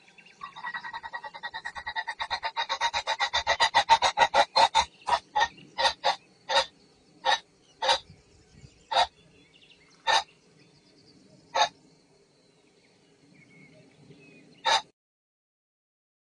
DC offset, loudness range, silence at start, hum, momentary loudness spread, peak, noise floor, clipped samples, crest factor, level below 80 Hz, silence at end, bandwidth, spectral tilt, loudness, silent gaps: under 0.1%; 12 LU; 0.4 s; none; 15 LU; -6 dBFS; -63 dBFS; under 0.1%; 24 dB; -62 dBFS; 1.55 s; 10 kHz; 0 dB/octave; -27 LUFS; none